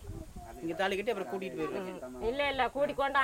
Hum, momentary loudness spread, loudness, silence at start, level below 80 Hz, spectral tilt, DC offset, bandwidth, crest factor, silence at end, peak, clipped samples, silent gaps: none; 12 LU; -34 LUFS; 0 s; -54 dBFS; -4.5 dB/octave; under 0.1%; 16 kHz; 18 dB; 0 s; -16 dBFS; under 0.1%; none